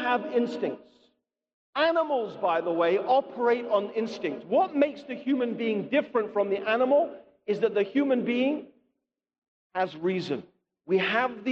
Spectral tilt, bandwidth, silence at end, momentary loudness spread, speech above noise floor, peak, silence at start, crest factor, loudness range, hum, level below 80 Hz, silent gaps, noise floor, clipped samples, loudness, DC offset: -6.5 dB/octave; 7.6 kHz; 0 s; 9 LU; 55 dB; -10 dBFS; 0 s; 16 dB; 3 LU; none; -74 dBFS; 1.54-1.73 s, 9.38-9.42 s, 9.48-9.70 s; -82 dBFS; under 0.1%; -27 LUFS; under 0.1%